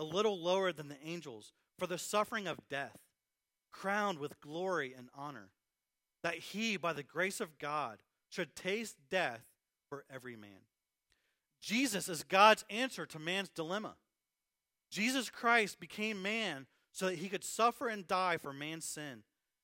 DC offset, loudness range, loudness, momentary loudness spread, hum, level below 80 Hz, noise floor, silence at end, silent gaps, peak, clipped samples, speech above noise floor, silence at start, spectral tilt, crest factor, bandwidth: under 0.1%; 8 LU; -36 LUFS; 16 LU; none; -82 dBFS; under -90 dBFS; 0.45 s; none; -12 dBFS; under 0.1%; over 53 dB; 0 s; -3 dB/octave; 26 dB; 16 kHz